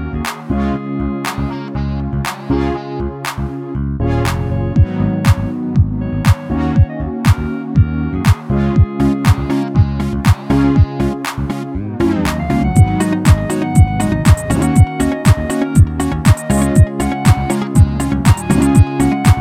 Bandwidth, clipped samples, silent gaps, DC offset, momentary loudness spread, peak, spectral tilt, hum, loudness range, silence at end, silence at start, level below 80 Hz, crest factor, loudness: 16 kHz; under 0.1%; none; under 0.1%; 9 LU; 0 dBFS; -7 dB/octave; none; 6 LU; 0 s; 0 s; -22 dBFS; 14 dB; -15 LUFS